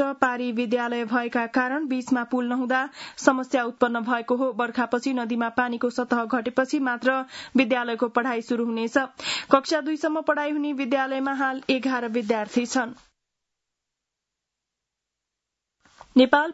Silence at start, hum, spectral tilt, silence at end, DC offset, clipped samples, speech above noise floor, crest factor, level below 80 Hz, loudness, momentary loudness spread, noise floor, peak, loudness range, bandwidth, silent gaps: 0 s; none; -4 dB/octave; 0 s; under 0.1%; under 0.1%; 61 dB; 22 dB; -70 dBFS; -24 LUFS; 5 LU; -85 dBFS; -2 dBFS; 5 LU; 8 kHz; none